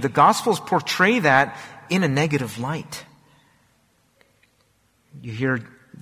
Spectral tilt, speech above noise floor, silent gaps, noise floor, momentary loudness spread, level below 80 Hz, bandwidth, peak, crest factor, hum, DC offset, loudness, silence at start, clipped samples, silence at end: -5 dB/octave; 43 dB; none; -63 dBFS; 19 LU; -60 dBFS; 16 kHz; -2 dBFS; 20 dB; none; under 0.1%; -21 LUFS; 0 s; under 0.1%; 0.35 s